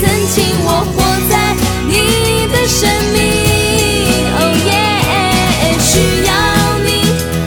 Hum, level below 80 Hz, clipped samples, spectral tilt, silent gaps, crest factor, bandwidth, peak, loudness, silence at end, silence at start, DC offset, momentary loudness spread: none; -24 dBFS; under 0.1%; -4 dB/octave; none; 12 dB; over 20 kHz; 0 dBFS; -11 LUFS; 0 s; 0 s; under 0.1%; 2 LU